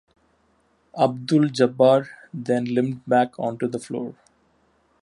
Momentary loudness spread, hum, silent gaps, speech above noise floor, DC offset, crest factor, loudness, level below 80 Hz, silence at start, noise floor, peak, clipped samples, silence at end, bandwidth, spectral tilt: 15 LU; none; none; 43 dB; under 0.1%; 18 dB; -22 LUFS; -70 dBFS; 0.95 s; -64 dBFS; -4 dBFS; under 0.1%; 0.9 s; 11.5 kHz; -6.5 dB/octave